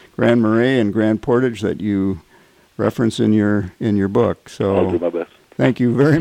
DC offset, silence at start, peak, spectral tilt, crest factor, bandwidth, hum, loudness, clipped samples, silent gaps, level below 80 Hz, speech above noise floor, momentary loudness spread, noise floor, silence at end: under 0.1%; 0.2 s; -2 dBFS; -7.5 dB/octave; 16 dB; 11.5 kHz; none; -18 LUFS; under 0.1%; none; -52 dBFS; 35 dB; 7 LU; -51 dBFS; 0 s